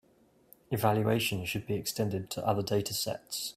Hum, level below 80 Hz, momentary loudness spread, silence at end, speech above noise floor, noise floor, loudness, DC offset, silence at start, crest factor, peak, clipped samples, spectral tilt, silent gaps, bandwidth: none; -62 dBFS; 7 LU; 0.05 s; 34 dB; -65 dBFS; -31 LUFS; under 0.1%; 0.7 s; 20 dB; -12 dBFS; under 0.1%; -4.5 dB/octave; none; 16 kHz